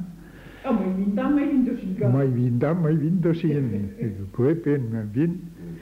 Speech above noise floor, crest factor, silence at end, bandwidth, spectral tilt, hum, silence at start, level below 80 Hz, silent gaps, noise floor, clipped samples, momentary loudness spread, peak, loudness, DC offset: 21 dB; 14 dB; 0 s; 7.6 kHz; -10 dB/octave; none; 0 s; -52 dBFS; none; -43 dBFS; under 0.1%; 9 LU; -10 dBFS; -24 LUFS; under 0.1%